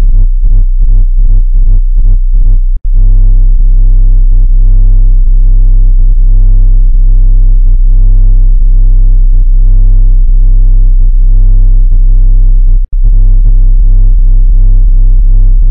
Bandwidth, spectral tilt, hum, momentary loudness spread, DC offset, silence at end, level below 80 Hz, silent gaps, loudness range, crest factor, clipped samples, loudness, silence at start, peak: 0.6 kHz; -13 dB/octave; none; 2 LU; under 0.1%; 0 s; -2 dBFS; none; 1 LU; 2 dB; 10%; -10 LUFS; 0 s; 0 dBFS